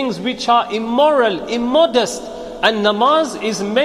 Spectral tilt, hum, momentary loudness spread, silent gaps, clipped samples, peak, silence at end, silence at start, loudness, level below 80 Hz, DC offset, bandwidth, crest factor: -3.5 dB/octave; none; 8 LU; none; under 0.1%; 0 dBFS; 0 s; 0 s; -16 LUFS; -50 dBFS; under 0.1%; 13.5 kHz; 16 dB